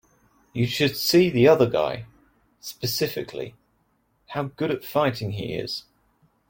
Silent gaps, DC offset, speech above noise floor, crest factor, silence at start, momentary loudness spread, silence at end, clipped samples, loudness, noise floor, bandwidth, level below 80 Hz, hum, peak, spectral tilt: none; under 0.1%; 45 dB; 20 dB; 0.55 s; 18 LU; 0.7 s; under 0.1%; -23 LUFS; -68 dBFS; 17 kHz; -58 dBFS; none; -4 dBFS; -5.5 dB/octave